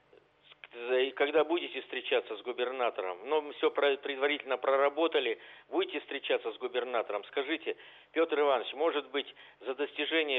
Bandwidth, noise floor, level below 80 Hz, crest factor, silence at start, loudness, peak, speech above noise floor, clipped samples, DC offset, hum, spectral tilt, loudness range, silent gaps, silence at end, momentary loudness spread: 4.2 kHz; -63 dBFS; -82 dBFS; 18 dB; 0.65 s; -32 LUFS; -14 dBFS; 31 dB; under 0.1%; under 0.1%; none; -5 dB/octave; 2 LU; none; 0 s; 10 LU